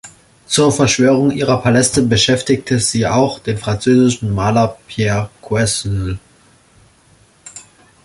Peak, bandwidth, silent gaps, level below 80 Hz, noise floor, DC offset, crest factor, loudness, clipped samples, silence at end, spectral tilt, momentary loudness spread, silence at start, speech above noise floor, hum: 0 dBFS; 11.5 kHz; none; -40 dBFS; -50 dBFS; under 0.1%; 16 dB; -15 LUFS; under 0.1%; 0.45 s; -4.5 dB/octave; 9 LU; 0.05 s; 36 dB; none